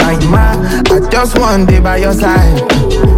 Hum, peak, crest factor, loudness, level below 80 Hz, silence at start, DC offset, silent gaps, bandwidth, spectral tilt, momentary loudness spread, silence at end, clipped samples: none; 0 dBFS; 8 dB; -10 LUFS; -12 dBFS; 0 s; under 0.1%; none; 16.5 kHz; -6 dB/octave; 2 LU; 0 s; under 0.1%